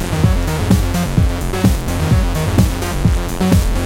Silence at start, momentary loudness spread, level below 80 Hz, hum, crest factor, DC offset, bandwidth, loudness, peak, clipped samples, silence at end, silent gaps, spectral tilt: 0 s; 3 LU; -20 dBFS; none; 14 dB; under 0.1%; 17 kHz; -16 LUFS; 0 dBFS; under 0.1%; 0 s; none; -6 dB/octave